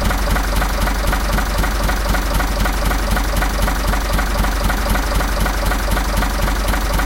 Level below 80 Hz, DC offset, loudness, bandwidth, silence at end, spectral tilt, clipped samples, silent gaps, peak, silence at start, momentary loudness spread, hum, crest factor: -18 dBFS; under 0.1%; -19 LUFS; 17 kHz; 0 s; -4.5 dB/octave; under 0.1%; none; -4 dBFS; 0 s; 1 LU; none; 12 dB